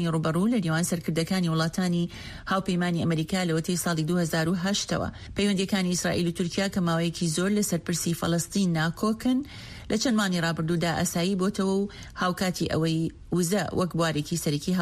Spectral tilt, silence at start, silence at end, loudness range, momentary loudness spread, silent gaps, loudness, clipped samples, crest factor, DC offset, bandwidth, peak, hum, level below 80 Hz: -5 dB/octave; 0 s; 0 s; 1 LU; 4 LU; none; -26 LUFS; under 0.1%; 14 dB; under 0.1%; 15.5 kHz; -12 dBFS; none; -50 dBFS